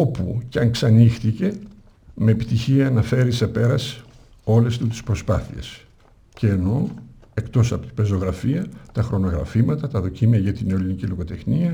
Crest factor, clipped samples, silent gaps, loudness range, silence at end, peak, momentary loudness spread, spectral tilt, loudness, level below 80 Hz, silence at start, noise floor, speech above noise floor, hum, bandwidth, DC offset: 16 dB; under 0.1%; none; 4 LU; 0 s; -4 dBFS; 11 LU; -7.5 dB/octave; -21 LUFS; -40 dBFS; 0 s; -51 dBFS; 32 dB; none; 10 kHz; under 0.1%